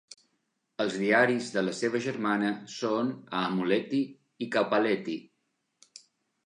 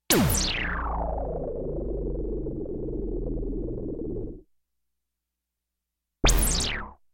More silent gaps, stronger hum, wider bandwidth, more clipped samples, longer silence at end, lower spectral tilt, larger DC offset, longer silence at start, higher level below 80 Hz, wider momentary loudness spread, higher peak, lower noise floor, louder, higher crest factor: neither; neither; second, 11 kHz vs 16.5 kHz; neither; first, 1.25 s vs 0.2 s; first, -5 dB/octave vs -3.5 dB/octave; neither; first, 0.8 s vs 0.1 s; second, -80 dBFS vs -32 dBFS; about the same, 11 LU vs 11 LU; about the same, -10 dBFS vs -8 dBFS; second, -78 dBFS vs -85 dBFS; about the same, -29 LUFS vs -28 LUFS; about the same, 20 dB vs 20 dB